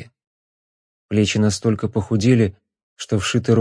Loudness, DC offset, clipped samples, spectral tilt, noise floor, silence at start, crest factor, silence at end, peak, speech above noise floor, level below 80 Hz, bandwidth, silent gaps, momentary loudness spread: -19 LUFS; under 0.1%; under 0.1%; -6 dB/octave; under -90 dBFS; 0 s; 16 dB; 0 s; -4 dBFS; over 72 dB; -50 dBFS; 10.5 kHz; 0.27-1.09 s, 2.83-2.96 s; 7 LU